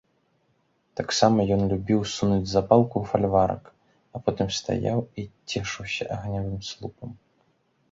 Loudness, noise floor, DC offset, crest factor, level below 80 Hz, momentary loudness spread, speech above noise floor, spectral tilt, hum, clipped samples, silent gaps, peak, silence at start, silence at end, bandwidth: -25 LUFS; -69 dBFS; under 0.1%; 24 dB; -48 dBFS; 17 LU; 44 dB; -5.5 dB/octave; none; under 0.1%; none; -2 dBFS; 0.95 s; 0.75 s; 7.8 kHz